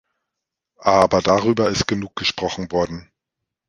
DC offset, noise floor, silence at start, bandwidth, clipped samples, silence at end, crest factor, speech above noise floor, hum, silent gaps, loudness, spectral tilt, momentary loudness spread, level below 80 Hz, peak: under 0.1%; -83 dBFS; 0.8 s; 11.5 kHz; under 0.1%; 0.7 s; 20 dB; 64 dB; none; none; -19 LUFS; -4.5 dB/octave; 9 LU; -46 dBFS; 0 dBFS